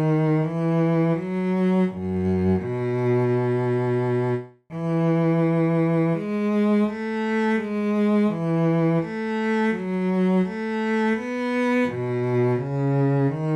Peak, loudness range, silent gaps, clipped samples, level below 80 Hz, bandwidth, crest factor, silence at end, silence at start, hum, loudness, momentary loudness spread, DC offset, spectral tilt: -12 dBFS; 1 LU; none; under 0.1%; -60 dBFS; 9.2 kHz; 10 dB; 0 s; 0 s; none; -23 LUFS; 5 LU; under 0.1%; -9 dB/octave